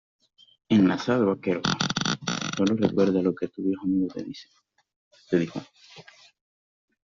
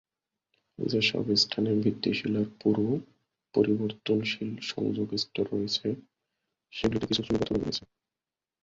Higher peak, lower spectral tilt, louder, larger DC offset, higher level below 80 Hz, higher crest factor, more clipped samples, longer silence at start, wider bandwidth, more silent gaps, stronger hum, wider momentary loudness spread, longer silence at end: first, -6 dBFS vs -10 dBFS; about the same, -5 dB/octave vs -5.5 dB/octave; first, -25 LUFS vs -29 LUFS; neither; second, -64 dBFS vs -58 dBFS; about the same, 20 dB vs 20 dB; neither; about the same, 0.7 s vs 0.8 s; about the same, 7.6 kHz vs 7.8 kHz; first, 4.96-5.11 s vs none; neither; about the same, 10 LU vs 9 LU; first, 1.15 s vs 0.85 s